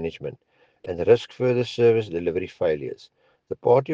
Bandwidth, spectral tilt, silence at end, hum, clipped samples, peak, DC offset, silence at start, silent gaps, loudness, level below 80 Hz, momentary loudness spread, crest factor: 7.6 kHz; -7.5 dB/octave; 0 s; none; under 0.1%; -6 dBFS; under 0.1%; 0 s; none; -23 LUFS; -60 dBFS; 17 LU; 18 dB